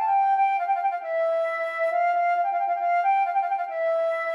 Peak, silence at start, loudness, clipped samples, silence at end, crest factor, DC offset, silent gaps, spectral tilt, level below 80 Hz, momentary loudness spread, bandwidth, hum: -14 dBFS; 0 s; -24 LUFS; under 0.1%; 0 s; 10 dB; under 0.1%; none; 0 dB/octave; under -90 dBFS; 5 LU; 7 kHz; none